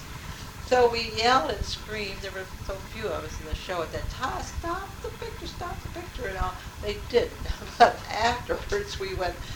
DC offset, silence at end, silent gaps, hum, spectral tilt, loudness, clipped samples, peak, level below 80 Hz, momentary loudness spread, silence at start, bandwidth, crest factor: under 0.1%; 0 s; none; none; -4 dB/octave; -28 LUFS; under 0.1%; -4 dBFS; -40 dBFS; 15 LU; 0 s; over 20 kHz; 24 dB